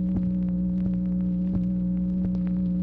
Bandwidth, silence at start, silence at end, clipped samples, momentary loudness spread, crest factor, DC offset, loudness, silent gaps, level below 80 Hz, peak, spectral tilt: 2.3 kHz; 0 s; 0 s; under 0.1%; 0 LU; 10 dB; under 0.1%; -26 LUFS; none; -40 dBFS; -16 dBFS; -12.5 dB/octave